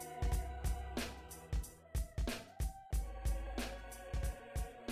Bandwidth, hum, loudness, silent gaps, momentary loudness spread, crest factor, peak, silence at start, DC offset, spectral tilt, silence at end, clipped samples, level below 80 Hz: 15.5 kHz; none; -43 LUFS; none; 5 LU; 14 dB; -26 dBFS; 0 s; under 0.1%; -5 dB/octave; 0 s; under 0.1%; -42 dBFS